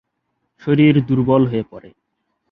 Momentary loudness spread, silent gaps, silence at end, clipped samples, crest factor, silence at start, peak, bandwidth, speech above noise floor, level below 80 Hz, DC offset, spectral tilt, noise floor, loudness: 15 LU; none; 0.75 s; under 0.1%; 16 dB; 0.65 s; -2 dBFS; 4.7 kHz; 57 dB; -50 dBFS; under 0.1%; -10.5 dB/octave; -72 dBFS; -16 LUFS